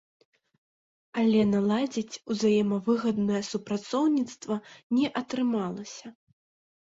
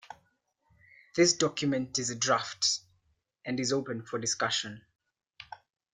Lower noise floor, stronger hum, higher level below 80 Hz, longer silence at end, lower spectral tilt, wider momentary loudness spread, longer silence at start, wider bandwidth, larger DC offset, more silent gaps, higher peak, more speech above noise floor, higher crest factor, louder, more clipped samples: first, under -90 dBFS vs -74 dBFS; neither; about the same, -68 dBFS vs -70 dBFS; first, 0.7 s vs 0.4 s; first, -6 dB/octave vs -2.5 dB/octave; second, 11 LU vs 19 LU; first, 1.15 s vs 0.1 s; second, 7.8 kHz vs 11 kHz; neither; first, 4.83-4.90 s vs none; about the same, -12 dBFS vs -12 dBFS; first, over 63 dB vs 44 dB; second, 16 dB vs 22 dB; about the same, -27 LUFS vs -29 LUFS; neither